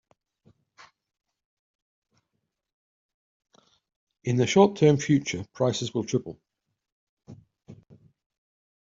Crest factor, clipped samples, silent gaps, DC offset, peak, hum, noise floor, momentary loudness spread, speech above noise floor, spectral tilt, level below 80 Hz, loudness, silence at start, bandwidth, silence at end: 24 dB; under 0.1%; 6.92-7.17 s; under 0.1%; -4 dBFS; none; -81 dBFS; 13 LU; 58 dB; -6 dB/octave; -66 dBFS; -24 LUFS; 4.25 s; 7.8 kHz; 1.2 s